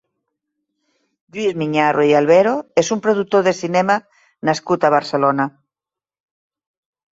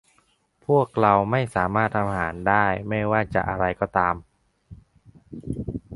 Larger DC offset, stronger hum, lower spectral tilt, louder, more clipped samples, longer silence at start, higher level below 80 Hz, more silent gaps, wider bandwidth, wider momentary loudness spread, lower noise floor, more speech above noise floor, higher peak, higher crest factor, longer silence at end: neither; neither; second, -5 dB/octave vs -8 dB/octave; first, -17 LUFS vs -23 LUFS; neither; first, 1.35 s vs 0.7 s; second, -62 dBFS vs -46 dBFS; neither; second, 8 kHz vs 11.5 kHz; second, 9 LU vs 13 LU; first, -90 dBFS vs -65 dBFS; first, 74 dB vs 42 dB; about the same, -2 dBFS vs -2 dBFS; second, 16 dB vs 22 dB; first, 1.6 s vs 0 s